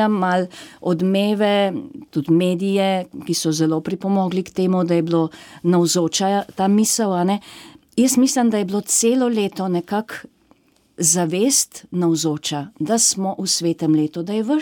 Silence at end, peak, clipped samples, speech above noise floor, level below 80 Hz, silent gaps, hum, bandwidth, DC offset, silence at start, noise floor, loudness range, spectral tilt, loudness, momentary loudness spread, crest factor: 0 s; -4 dBFS; under 0.1%; 38 dB; -64 dBFS; none; none; 17.5 kHz; under 0.1%; 0 s; -57 dBFS; 2 LU; -4.5 dB/octave; -19 LUFS; 9 LU; 14 dB